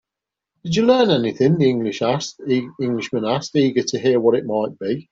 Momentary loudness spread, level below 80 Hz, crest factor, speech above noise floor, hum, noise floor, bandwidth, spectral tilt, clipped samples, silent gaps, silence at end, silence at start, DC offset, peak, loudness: 8 LU; -60 dBFS; 16 dB; 67 dB; none; -86 dBFS; 7.8 kHz; -6 dB/octave; under 0.1%; none; 0.1 s; 0.65 s; under 0.1%; -2 dBFS; -19 LUFS